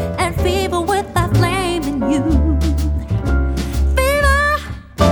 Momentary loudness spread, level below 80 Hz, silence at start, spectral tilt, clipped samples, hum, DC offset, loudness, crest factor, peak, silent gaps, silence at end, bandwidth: 6 LU; -20 dBFS; 0 s; -6 dB/octave; under 0.1%; none; under 0.1%; -17 LUFS; 14 dB; -2 dBFS; none; 0 s; 19.5 kHz